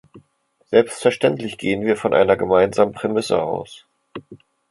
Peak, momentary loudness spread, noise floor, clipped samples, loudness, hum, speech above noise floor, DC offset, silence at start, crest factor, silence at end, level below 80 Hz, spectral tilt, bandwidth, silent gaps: 0 dBFS; 22 LU; -62 dBFS; under 0.1%; -19 LUFS; none; 44 dB; under 0.1%; 0.15 s; 18 dB; 0.35 s; -54 dBFS; -5.5 dB/octave; 11.5 kHz; none